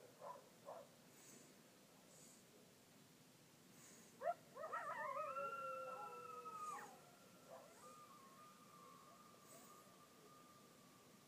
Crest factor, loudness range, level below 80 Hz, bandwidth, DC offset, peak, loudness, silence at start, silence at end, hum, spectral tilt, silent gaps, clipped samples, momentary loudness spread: 22 dB; 14 LU; under -90 dBFS; 15.5 kHz; under 0.1%; -34 dBFS; -54 LUFS; 0 s; 0 s; none; -3 dB/octave; none; under 0.1%; 19 LU